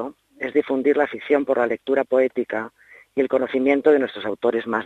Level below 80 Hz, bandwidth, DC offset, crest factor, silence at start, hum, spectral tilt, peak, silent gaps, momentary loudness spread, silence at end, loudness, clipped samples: -66 dBFS; 6.2 kHz; under 0.1%; 18 dB; 0 s; none; -6.5 dB/octave; -4 dBFS; none; 11 LU; 0 s; -21 LUFS; under 0.1%